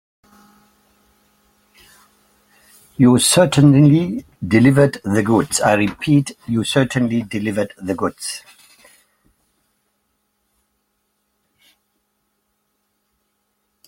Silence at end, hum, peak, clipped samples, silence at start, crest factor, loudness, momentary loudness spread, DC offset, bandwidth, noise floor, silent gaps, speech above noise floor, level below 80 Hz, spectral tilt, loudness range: 5.5 s; none; 0 dBFS; under 0.1%; 3 s; 18 dB; -16 LUFS; 13 LU; under 0.1%; 16.5 kHz; -70 dBFS; none; 54 dB; -52 dBFS; -5.5 dB/octave; 13 LU